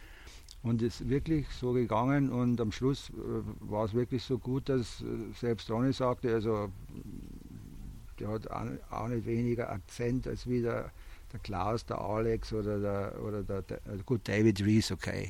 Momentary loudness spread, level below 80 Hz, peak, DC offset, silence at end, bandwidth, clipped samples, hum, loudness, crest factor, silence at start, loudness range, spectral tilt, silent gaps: 17 LU; -48 dBFS; -14 dBFS; under 0.1%; 0 s; 16 kHz; under 0.1%; none; -33 LUFS; 18 dB; 0 s; 5 LU; -7 dB/octave; none